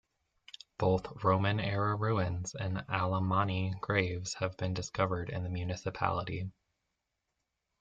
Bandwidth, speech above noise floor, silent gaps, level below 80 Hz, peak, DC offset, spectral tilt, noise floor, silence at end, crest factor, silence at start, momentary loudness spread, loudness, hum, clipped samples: 7.8 kHz; 52 dB; none; -60 dBFS; -12 dBFS; under 0.1%; -6 dB/octave; -85 dBFS; 1.3 s; 22 dB; 0.8 s; 7 LU; -33 LUFS; none; under 0.1%